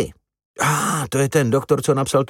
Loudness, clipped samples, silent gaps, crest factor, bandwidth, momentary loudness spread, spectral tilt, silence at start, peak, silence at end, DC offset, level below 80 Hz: -19 LUFS; under 0.1%; 0.45-0.54 s; 16 dB; 17 kHz; 3 LU; -5 dB/octave; 0 s; -4 dBFS; 0.05 s; under 0.1%; -50 dBFS